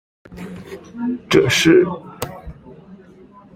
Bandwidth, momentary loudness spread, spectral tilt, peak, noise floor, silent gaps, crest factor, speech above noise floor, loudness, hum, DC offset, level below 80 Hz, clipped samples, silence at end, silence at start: 16.5 kHz; 23 LU; -4.5 dB/octave; 0 dBFS; -45 dBFS; none; 20 dB; 29 dB; -16 LUFS; none; under 0.1%; -48 dBFS; under 0.1%; 0.6 s; 0.3 s